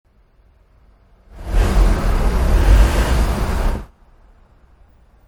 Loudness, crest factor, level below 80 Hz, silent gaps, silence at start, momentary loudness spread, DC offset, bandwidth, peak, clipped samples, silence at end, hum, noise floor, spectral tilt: -18 LUFS; 16 dB; -18 dBFS; none; 1.35 s; 10 LU; under 0.1%; 14 kHz; 0 dBFS; under 0.1%; 1.4 s; none; -53 dBFS; -6 dB/octave